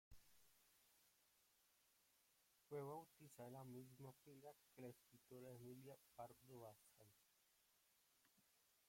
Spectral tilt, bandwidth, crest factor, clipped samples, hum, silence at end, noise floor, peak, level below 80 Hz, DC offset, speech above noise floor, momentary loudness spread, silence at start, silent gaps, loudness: -6 dB/octave; 16.5 kHz; 20 dB; under 0.1%; none; 0 s; -81 dBFS; -44 dBFS; -88 dBFS; under 0.1%; 21 dB; 9 LU; 0.1 s; none; -61 LUFS